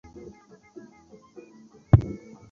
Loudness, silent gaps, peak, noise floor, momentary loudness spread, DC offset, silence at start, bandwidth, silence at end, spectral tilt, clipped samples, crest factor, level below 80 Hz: -23 LUFS; none; -2 dBFS; -53 dBFS; 27 LU; under 0.1%; 1.95 s; 6.8 kHz; 0.35 s; -10.5 dB/octave; under 0.1%; 26 dB; -38 dBFS